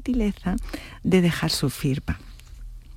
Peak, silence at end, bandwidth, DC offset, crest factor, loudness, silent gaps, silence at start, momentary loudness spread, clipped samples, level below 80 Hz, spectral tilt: -8 dBFS; 0 s; 16.5 kHz; under 0.1%; 18 dB; -25 LUFS; none; 0 s; 21 LU; under 0.1%; -36 dBFS; -5.5 dB/octave